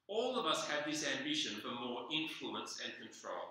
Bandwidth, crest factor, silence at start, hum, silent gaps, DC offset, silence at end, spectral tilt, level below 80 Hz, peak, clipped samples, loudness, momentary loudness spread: 16 kHz; 20 dB; 0.1 s; none; none; under 0.1%; 0 s; -2 dB/octave; -86 dBFS; -20 dBFS; under 0.1%; -39 LUFS; 10 LU